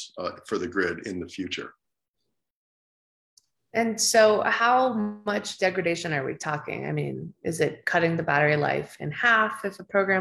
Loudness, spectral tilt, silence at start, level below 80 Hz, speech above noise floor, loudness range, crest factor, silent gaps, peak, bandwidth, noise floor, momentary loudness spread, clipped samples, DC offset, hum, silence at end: -25 LUFS; -4 dB/octave; 0 s; -68 dBFS; 56 dB; 10 LU; 20 dB; 2.08-2.14 s, 2.50-3.37 s; -6 dBFS; 13.5 kHz; -81 dBFS; 13 LU; under 0.1%; under 0.1%; none; 0 s